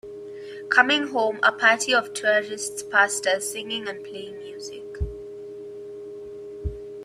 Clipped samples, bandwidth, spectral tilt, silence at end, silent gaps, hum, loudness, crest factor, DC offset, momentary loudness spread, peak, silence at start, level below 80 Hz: under 0.1%; 15.5 kHz; -2 dB/octave; 0 s; none; none; -22 LUFS; 22 dB; under 0.1%; 20 LU; -2 dBFS; 0.05 s; -44 dBFS